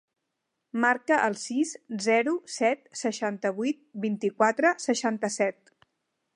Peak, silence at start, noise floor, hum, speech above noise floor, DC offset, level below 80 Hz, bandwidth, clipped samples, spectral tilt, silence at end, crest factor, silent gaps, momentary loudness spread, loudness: -8 dBFS; 0.75 s; -82 dBFS; none; 55 dB; under 0.1%; -82 dBFS; 11.5 kHz; under 0.1%; -4 dB/octave; 0.85 s; 20 dB; none; 8 LU; -27 LUFS